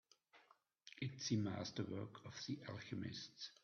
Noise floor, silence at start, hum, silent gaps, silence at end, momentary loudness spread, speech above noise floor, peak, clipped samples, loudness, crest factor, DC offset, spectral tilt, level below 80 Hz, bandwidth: -74 dBFS; 0.35 s; none; none; 0.1 s; 11 LU; 27 dB; -28 dBFS; under 0.1%; -47 LUFS; 20 dB; under 0.1%; -5 dB/octave; -82 dBFS; 7 kHz